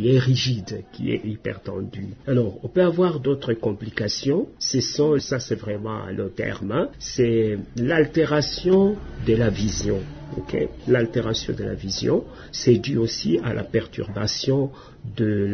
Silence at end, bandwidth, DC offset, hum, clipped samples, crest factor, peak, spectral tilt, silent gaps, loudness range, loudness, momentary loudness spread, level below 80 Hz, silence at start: 0 s; 6.6 kHz; under 0.1%; none; under 0.1%; 18 dB; -4 dBFS; -5.5 dB/octave; none; 3 LU; -23 LUFS; 10 LU; -44 dBFS; 0 s